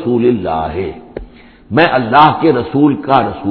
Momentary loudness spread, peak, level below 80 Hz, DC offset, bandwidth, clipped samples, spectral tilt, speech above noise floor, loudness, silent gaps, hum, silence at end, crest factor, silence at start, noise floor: 16 LU; 0 dBFS; -40 dBFS; under 0.1%; 5.4 kHz; 0.2%; -9.5 dB/octave; 23 dB; -12 LUFS; none; none; 0 s; 12 dB; 0 s; -35 dBFS